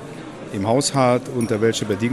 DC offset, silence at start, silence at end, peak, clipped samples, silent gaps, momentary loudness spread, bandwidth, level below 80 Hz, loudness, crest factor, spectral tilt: under 0.1%; 0 s; 0 s; -4 dBFS; under 0.1%; none; 15 LU; 13.5 kHz; -56 dBFS; -20 LUFS; 16 dB; -5 dB/octave